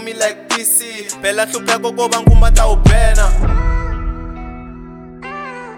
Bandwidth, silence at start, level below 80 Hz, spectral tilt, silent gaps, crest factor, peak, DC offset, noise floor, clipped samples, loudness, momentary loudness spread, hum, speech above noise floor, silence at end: 18 kHz; 0 s; -14 dBFS; -4 dB/octave; none; 12 dB; 0 dBFS; under 0.1%; -32 dBFS; under 0.1%; -15 LUFS; 19 LU; none; 21 dB; 0 s